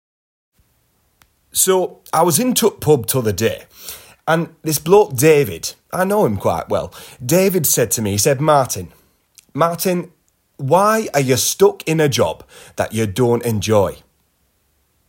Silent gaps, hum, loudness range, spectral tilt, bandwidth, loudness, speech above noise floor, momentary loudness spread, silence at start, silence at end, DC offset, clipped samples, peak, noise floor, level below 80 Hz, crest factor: none; none; 2 LU; -4.5 dB/octave; 16.5 kHz; -16 LUFS; 46 dB; 14 LU; 1.55 s; 1.15 s; under 0.1%; under 0.1%; 0 dBFS; -63 dBFS; -50 dBFS; 16 dB